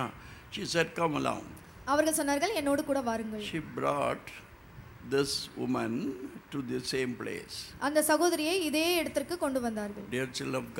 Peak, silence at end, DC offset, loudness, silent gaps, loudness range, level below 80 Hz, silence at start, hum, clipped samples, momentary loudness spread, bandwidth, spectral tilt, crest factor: -12 dBFS; 0 s; under 0.1%; -31 LUFS; none; 4 LU; -60 dBFS; 0 s; none; under 0.1%; 14 LU; 17 kHz; -3.5 dB/octave; 20 dB